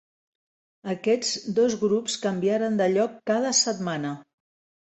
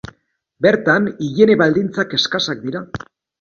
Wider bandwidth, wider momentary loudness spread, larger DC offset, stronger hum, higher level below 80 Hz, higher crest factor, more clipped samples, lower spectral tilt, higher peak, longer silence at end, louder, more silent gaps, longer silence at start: first, 8.4 kHz vs 7.2 kHz; second, 10 LU vs 14 LU; neither; neither; second, -70 dBFS vs -52 dBFS; about the same, 16 dB vs 18 dB; neither; second, -3.5 dB/octave vs -5 dB/octave; second, -10 dBFS vs 0 dBFS; first, 0.6 s vs 0.45 s; second, -24 LUFS vs -16 LUFS; neither; first, 0.85 s vs 0.6 s